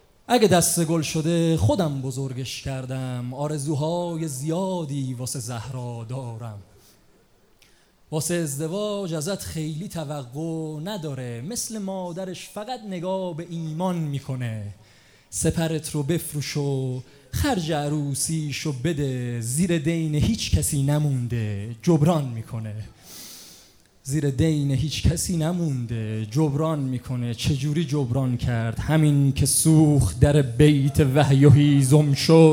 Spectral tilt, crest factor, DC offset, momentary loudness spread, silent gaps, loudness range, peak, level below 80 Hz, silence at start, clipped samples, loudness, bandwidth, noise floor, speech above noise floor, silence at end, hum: -6 dB/octave; 20 dB; under 0.1%; 15 LU; none; 11 LU; -4 dBFS; -44 dBFS; 0.3 s; under 0.1%; -23 LUFS; 18 kHz; -58 dBFS; 35 dB; 0 s; none